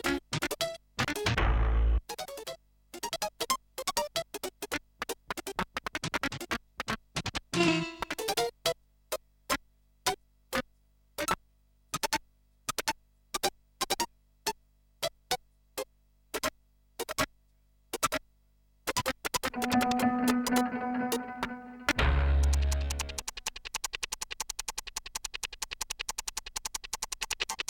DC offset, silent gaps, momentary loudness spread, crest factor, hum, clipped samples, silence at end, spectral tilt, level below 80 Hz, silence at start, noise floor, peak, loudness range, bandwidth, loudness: under 0.1%; none; 12 LU; 22 dB; 50 Hz at -65 dBFS; under 0.1%; 0.1 s; -3.5 dB/octave; -38 dBFS; 0.05 s; -67 dBFS; -12 dBFS; 6 LU; 17.5 kHz; -33 LUFS